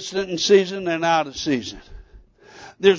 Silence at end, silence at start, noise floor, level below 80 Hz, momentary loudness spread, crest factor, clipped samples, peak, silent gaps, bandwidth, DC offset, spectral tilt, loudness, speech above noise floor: 0 s; 0 s; -48 dBFS; -50 dBFS; 11 LU; 20 dB; under 0.1%; -2 dBFS; none; 7.6 kHz; under 0.1%; -4 dB/octave; -20 LUFS; 27 dB